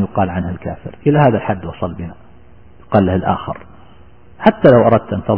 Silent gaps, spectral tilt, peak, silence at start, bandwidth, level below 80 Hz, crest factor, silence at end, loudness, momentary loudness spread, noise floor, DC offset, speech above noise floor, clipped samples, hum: none; -11 dB/octave; 0 dBFS; 0 s; 5.4 kHz; -42 dBFS; 16 dB; 0 s; -15 LUFS; 18 LU; -44 dBFS; 0.9%; 30 dB; under 0.1%; none